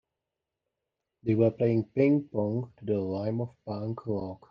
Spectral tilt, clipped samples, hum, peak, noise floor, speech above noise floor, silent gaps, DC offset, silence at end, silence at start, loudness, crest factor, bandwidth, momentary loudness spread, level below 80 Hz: -11 dB/octave; under 0.1%; none; -12 dBFS; -87 dBFS; 59 dB; none; under 0.1%; 0.15 s; 1.25 s; -29 LUFS; 18 dB; 5.6 kHz; 10 LU; -68 dBFS